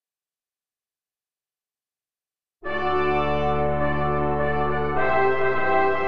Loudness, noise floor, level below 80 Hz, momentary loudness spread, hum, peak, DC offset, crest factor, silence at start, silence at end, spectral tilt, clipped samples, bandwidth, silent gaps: -23 LUFS; under -90 dBFS; -42 dBFS; 4 LU; none; -8 dBFS; under 0.1%; 16 dB; 0 s; 0 s; -8.5 dB/octave; under 0.1%; 6.2 kHz; none